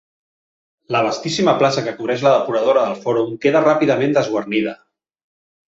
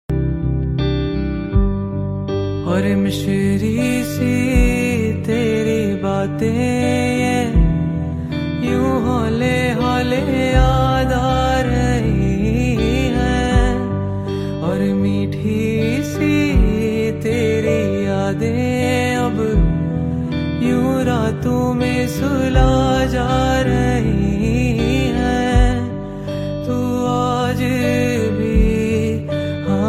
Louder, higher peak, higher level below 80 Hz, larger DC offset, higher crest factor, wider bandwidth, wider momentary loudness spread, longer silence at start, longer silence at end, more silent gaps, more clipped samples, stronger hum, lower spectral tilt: about the same, -17 LUFS vs -18 LUFS; about the same, -2 dBFS vs 0 dBFS; second, -62 dBFS vs -24 dBFS; neither; about the same, 16 dB vs 16 dB; second, 8 kHz vs 15.5 kHz; about the same, 6 LU vs 5 LU; first, 0.9 s vs 0.1 s; first, 0.95 s vs 0 s; neither; neither; neither; second, -5.5 dB/octave vs -7 dB/octave